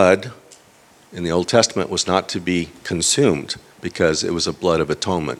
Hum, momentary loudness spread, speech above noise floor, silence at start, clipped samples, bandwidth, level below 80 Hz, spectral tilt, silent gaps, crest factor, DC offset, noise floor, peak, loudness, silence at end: none; 12 LU; 32 dB; 0 s; under 0.1%; 15 kHz; -48 dBFS; -3.5 dB/octave; none; 20 dB; under 0.1%; -51 dBFS; 0 dBFS; -19 LUFS; 0 s